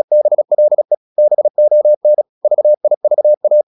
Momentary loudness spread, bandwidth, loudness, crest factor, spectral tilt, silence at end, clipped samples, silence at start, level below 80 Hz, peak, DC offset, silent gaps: 4 LU; 1.1 kHz; -12 LUFS; 6 dB; -11 dB/octave; 0.05 s; under 0.1%; 0.1 s; -80 dBFS; -4 dBFS; under 0.1%; 0.97-1.16 s, 1.50-1.54 s, 1.97-2.01 s, 2.29-2.41 s, 2.97-3.01 s, 3.37-3.41 s